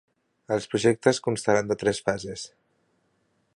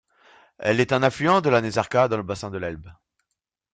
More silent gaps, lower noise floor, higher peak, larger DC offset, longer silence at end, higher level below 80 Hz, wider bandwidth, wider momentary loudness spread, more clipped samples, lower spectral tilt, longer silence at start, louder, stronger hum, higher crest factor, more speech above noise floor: neither; second, -70 dBFS vs -82 dBFS; about the same, -4 dBFS vs -2 dBFS; neither; first, 1.1 s vs 0.8 s; about the same, -60 dBFS vs -56 dBFS; first, 11.5 kHz vs 9.4 kHz; about the same, 14 LU vs 12 LU; neither; second, -4.5 dB/octave vs -6 dB/octave; about the same, 0.5 s vs 0.6 s; second, -25 LUFS vs -22 LUFS; neither; about the same, 22 dB vs 22 dB; second, 46 dB vs 60 dB